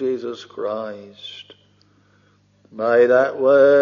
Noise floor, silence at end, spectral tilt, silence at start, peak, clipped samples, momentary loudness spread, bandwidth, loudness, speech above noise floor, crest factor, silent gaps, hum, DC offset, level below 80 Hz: -58 dBFS; 0 s; -3 dB/octave; 0 s; -4 dBFS; under 0.1%; 21 LU; 7 kHz; -18 LUFS; 40 dB; 16 dB; none; 50 Hz at -60 dBFS; under 0.1%; -74 dBFS